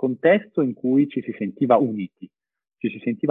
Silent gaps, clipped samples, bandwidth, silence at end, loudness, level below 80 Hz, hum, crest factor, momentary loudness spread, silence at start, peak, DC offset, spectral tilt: none; under 0.1%; 3.8 kHz; 0 s; -22 LUFS; -68 dBFS; none; 18 dB; 11 LU; 0 s; -4 dBFS; under 0.1%; -10 dB/octave